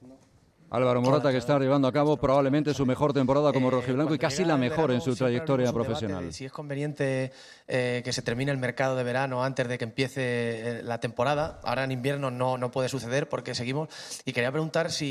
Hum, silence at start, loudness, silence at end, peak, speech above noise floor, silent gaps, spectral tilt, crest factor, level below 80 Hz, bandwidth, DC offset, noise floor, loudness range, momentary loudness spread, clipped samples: none; 0 s; -27 LUFS; 0 s; -10 dBFS; 33 dB; none; -6 dB/octave; 16 dB; -58 dBFS; 13 kHz; under 0.1%; -59 dBFS; 5 LU; 9 LU; under 0.1%